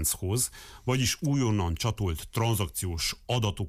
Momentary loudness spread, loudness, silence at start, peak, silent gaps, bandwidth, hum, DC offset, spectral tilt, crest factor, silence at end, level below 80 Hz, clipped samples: 5 LU; -29 LUFS; 0 s; -16 dBFS; none; 16 kHz; none; under 0.1%; -4.5 dB/octave; 12 dB; 0 s; -44 dBFS; under 0.1%